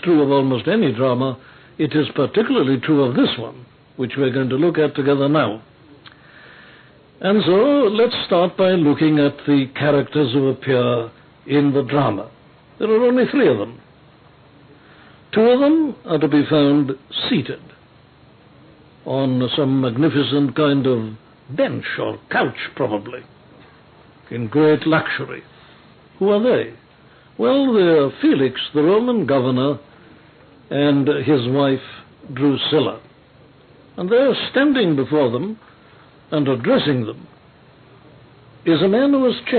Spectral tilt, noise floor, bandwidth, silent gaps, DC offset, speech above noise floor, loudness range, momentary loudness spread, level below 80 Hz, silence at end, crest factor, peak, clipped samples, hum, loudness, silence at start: -11.5 dB/octave; -49 dBFS; 4.5 kHz; none; under 0.1%; 32 dB; 4 LU; 13 LU; -62 dBFS; 0 s; 12 dB; -6 dBFS; under 0.1%; none; -18 LUFS; 0.05 s